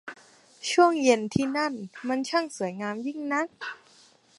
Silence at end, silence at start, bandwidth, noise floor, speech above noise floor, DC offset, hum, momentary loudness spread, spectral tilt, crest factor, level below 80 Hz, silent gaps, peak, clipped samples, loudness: 0.65 s; 0.05 s; 11.5 kHz; -58 dBFS; 32 dB; under 0.1%; none; 16 LU; -4.5 dB/octave; 20 dB; -64 dBFS; none; -6 dBFS; under 0.1%; -26 LUFS